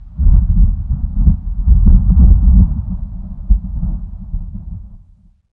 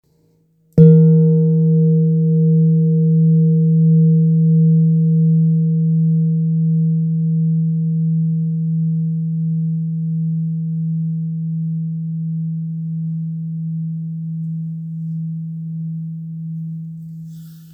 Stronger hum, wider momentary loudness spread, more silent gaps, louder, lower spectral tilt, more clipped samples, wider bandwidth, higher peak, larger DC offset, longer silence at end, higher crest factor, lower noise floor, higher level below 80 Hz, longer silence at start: neither; first, 18 LU vs 14 LU; neither; about the same, -15 LUFS vs -16 LUFS; about the same, -15 dB/octave vs -14.5 dB/octave; neither; first, 1.3 kHz vs 0.7 kHz; about the same, 0 dBFS vs 0 dBFS; neither; first, 0.55 s vs 0 s; about the same, 12 dB vs 16 dB; second, -47 dBFS vs -58 dBFS; first, -12 dBFS vs -56 dBFS; second, 0 s vs 0.75 s